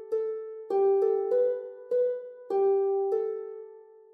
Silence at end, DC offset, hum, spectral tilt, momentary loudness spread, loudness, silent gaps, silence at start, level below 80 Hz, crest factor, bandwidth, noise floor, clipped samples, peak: 0.35 s; under 0.1%; none; -7 dB/octave; 13 LU; -28 LUFS; none; 0 s; under -90 dBFS; 12 dB; 3.3 kHz; -50 dBFS; under 0.1%; -16 dBFS